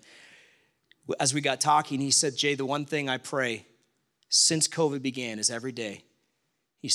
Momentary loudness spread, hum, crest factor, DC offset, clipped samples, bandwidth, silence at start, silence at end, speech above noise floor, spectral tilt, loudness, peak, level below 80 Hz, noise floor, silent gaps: 15 LU; none; 20 dB; under 0.1%; under 0.1%; 15 kHz; 1.1 s; 0 s; 50 dB; -2 dB/octave; -26 LUFS; -8 dBFS; -78 dBFS; -77 dBFS; none